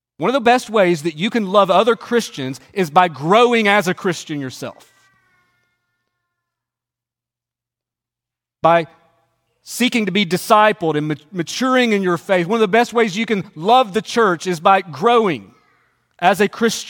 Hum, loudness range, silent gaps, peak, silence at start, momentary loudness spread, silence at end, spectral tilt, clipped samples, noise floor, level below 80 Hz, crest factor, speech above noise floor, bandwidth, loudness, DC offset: none; 8 LU; none; 0 dBFS; 0.2 s; 12 LU; 0 s; -4.5 dB/octave; under 0.1%; -88 dBFS; -66 dBFS; 18 dB; 72 dB; 17.5 kHz; -16 LUFS; under 0.1%